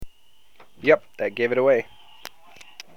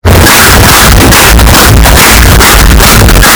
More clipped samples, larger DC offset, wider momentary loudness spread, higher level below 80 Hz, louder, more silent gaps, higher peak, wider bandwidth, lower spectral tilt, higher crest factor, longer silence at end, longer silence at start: second, under 0.1% vs 70%; neither; first, 22 LU vs 1 LU; second, -56 dBFS vs -6 dBFS; second, -22 LUFS vs -1 LUFS; neither; about the same, -2 dBFS vs 0 dBFS; second, 16.5 kHz vs over 20 kHz; first, -5.5 dB/octave vs -3.5 dB/octave; first, 22 dB vs 0 dB; first, 1.15 s vs 0 s; about the same, 0 s vs 0.05 s